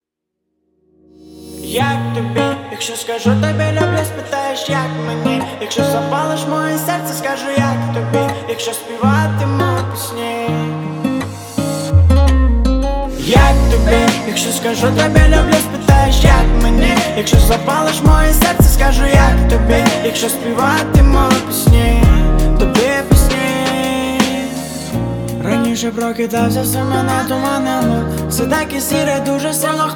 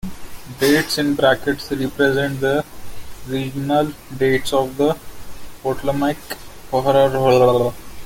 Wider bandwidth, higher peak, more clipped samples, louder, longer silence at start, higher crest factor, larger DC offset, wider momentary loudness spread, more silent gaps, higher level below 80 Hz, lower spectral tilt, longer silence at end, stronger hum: first, 19.5 kHz vs 17 kHz; about the same, 0 dBFS vs -2 dBFS; neither; first, -14 LUFS vs -19 LUFS; first, 1.3 s vs 0.05 s; about the same, 12 dB vs 16 dB; neither; second, 9 LU vs 18 LU; neither; first, -18 dBFS vs -42 dBFS; about the same, -5 dB/octave vs -5 dB/octave; about the same, 0 s vs 0 s; neither